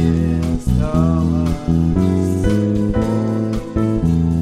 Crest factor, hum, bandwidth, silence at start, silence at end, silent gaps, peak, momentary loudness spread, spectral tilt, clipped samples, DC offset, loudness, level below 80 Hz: 12 dB; none; 12.5 kHz; 0 s; 0 s; none; -4 dBFS; 3 LU; -8.5 dB/octave; under 0.1%; under 0.1%; -17 LUFS; -26 dBFS